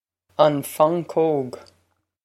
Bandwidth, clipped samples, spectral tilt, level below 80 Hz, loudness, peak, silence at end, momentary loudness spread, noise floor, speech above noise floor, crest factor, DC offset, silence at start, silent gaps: 15.5 kHz; under 0.1%; -6 dB/octave; -72 dBFS; -21 LUFS; 0 dBFS; 0.65 s; 15 LU; -68 dBFS; 48 dB; 22 dB; under 0.1%; 0.4 s; none